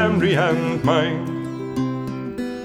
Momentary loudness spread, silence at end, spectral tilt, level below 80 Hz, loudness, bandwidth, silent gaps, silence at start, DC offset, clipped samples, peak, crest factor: 10 LU; 0 s; -7 dB/octave; -50 dBFS; -22 LUFS; 13 kHz; none; 0 s; under 0.1%; under 0.1%; -6 dBFS; 16 dB